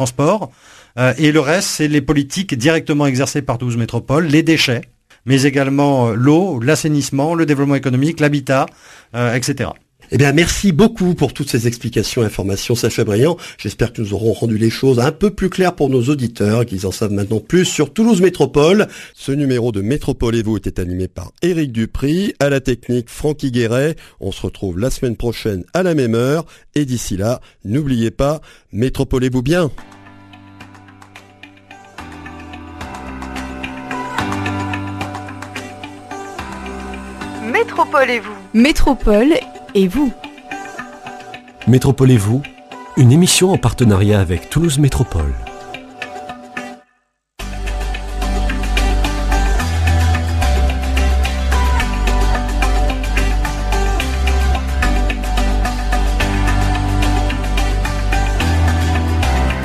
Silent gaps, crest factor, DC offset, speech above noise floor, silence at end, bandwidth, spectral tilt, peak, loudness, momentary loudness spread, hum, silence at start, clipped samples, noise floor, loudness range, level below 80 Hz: none; 16 dB; under 0.1%; 48 dB; 0 s; 14 kHz; -5.5 dB/octave; 0 dBFS; -16 LUFS; 15 LU; none; 0 s; under 0.1%; -63 dBFS; 10 LU; -22 dBFS